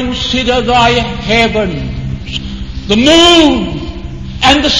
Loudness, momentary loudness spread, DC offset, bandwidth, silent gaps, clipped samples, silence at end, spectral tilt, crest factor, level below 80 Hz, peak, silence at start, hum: -10 LUFS; 18 LU; 2%; 11 kHz; none; 0.9%; 0 s; -4 dB/octave; 12 dB; -26 dBFS; 0 dBFS; 0 s; none